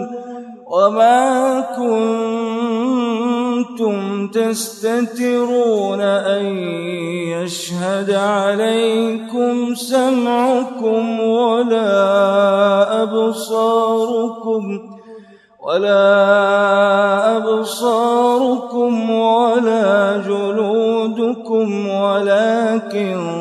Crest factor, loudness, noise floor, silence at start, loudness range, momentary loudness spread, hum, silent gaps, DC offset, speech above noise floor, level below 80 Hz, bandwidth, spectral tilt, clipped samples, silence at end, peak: 14 dB; -16 LUFS; -41 dBFS; 0 s; 4 LU; 8 LU; none; none; under 0.1%; 26 dB; -72 dBFS; 13 kHz; -5 dB/octave; under 0.1%; 0 s; 0 dBFS